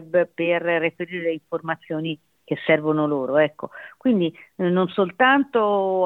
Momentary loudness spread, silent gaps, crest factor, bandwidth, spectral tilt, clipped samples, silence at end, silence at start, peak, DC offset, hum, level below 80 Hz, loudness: 10 LU; none; 18 dB; 4.2 kHz; -8.5 dB/octave; under 0.1%; 0 s; 0 s; -4 dBFS; under 0.1%; none; -70 dBFS; -22 LUFS